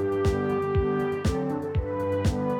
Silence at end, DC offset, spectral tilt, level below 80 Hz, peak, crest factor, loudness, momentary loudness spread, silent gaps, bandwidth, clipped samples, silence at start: 0 s; under 0.1%; -7.5 dB/octave; -36 dBFS; -12 dBFS; 12 dB; -27 LUFS; 3 LU; none; 15 kHz; under 0.1%; 0 s